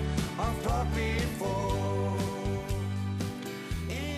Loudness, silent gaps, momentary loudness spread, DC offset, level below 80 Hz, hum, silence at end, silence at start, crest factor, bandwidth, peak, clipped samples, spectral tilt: -32 LUFS; none; 5 LU; under 0.1%; -38 dBFS; none; 0 s; 0 s; 12 dB; 14.5 kHz; -18 dBFS; under 0.1%; -6 dB/octave